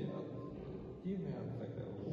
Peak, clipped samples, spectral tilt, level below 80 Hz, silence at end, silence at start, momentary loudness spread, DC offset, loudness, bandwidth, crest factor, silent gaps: -30 dBFS; under 0.1%; -10 dB/octave; -62 dBFS; 0 s; 0 s; 5 LU; under 0.1%; -45 LUFS; 6.8 kHz; 14 dB; none